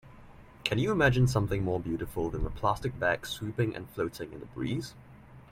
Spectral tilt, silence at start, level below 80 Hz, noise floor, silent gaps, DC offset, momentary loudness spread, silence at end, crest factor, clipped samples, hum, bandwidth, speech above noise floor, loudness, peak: -6 dB/octave; 0.05 s; -46 dBFS; -52 dBFS; none; under 0.1%; 11 LU; 0.1 s; 20 dB; under 0.1%; none; 16 kHz; 22 dB; -31 LUFS; -10 dBFS